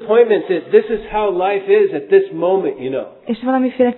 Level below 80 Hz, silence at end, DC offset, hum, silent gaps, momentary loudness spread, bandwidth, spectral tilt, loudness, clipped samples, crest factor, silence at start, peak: -48 dBFS; 0 s; under 0.1%; none; none; 10 LU; 4.2 kHz; -10 dB/octave; -16 LUFS; under 0.1%; 16 dB; 0 s; 0 dBFS